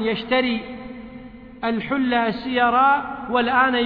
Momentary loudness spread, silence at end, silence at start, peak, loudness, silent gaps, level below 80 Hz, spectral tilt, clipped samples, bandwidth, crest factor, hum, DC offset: 20 LU; 0 s; 0 s; -6 dBFS; -20 LUFS; none; -52 dBFS; -7.5 dB/octave; under 0.1%; 5.2 kHz; 14 dB; none; under 0.1%